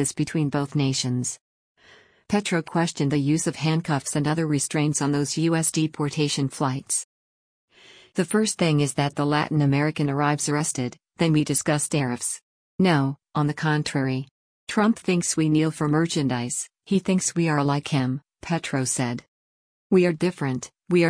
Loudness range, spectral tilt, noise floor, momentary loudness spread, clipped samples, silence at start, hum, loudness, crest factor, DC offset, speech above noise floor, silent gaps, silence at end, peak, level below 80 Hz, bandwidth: 2 LU; -5 dB/octave; -55 dBFS; 7 LU; under 0.1%; 0 s; none; -24 LUFS; 16 dB; under 0.1%; 32 dB; 1.41-1.75 s, 7.04-7.68 s, 12.42-12.78 s, 14.31-14.67 s, 19.28-19.90 s; 0 s; -8 dBFS; -60 dBFS; 10.5 kHz